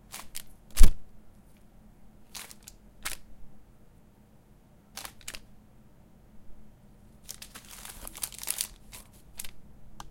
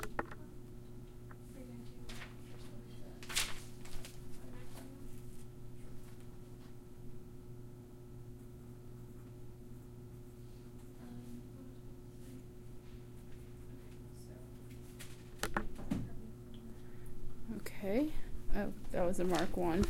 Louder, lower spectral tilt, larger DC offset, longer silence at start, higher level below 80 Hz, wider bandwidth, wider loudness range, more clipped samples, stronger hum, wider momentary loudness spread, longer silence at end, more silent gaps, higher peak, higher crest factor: first, -37 LUFS vs -46 LUFS; second, -2.5 dB/octave vs -5 dB/octave; neither; first, 0.35 s vs 0 s; first, -32 dBFS vs -50 dBFS; about the same, 17 kHz vs 16.5 kHz; about the same, 13 LU vs 11 LU; neither; neither; first, 26 LU vs 17 LU; first, 0.65 s vs 0 s; neither; first, -2 dBFS vs -18 dBFS; about the same, 26 dB vs 22 dB